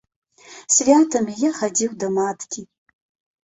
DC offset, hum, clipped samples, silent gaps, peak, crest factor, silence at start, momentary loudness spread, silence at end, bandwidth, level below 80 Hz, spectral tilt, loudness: under 0.1%; none; under 0.1%; none; -2 dBFS; 18 dB; 0.5 s; 17 LU; 0.8 s; 8.4 kHz; -64 dBFS; -3.5 dB/octave; -19 LUFS